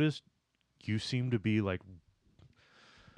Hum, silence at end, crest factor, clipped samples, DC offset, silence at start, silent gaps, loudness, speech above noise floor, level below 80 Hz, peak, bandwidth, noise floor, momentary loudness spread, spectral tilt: none; 1.2 s; 18 dB; under 0.1%; under 0.1%; 0 s; none; -35 LUFS; 44 dB; -68 dBFS; -18 dBFS; 10 kHz; -77 dBFS; 13 LU; -6.5 dB/octave